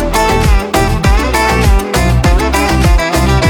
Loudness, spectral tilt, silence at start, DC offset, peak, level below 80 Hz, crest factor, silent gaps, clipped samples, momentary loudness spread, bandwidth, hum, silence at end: -11 LUFS; -5 dB/octave; 0 s; under 0.1%; 0 dBFS; -14 dBFS; 10 dB; none; under 0.1%; 1 LU; 19 kHz; none; 0 s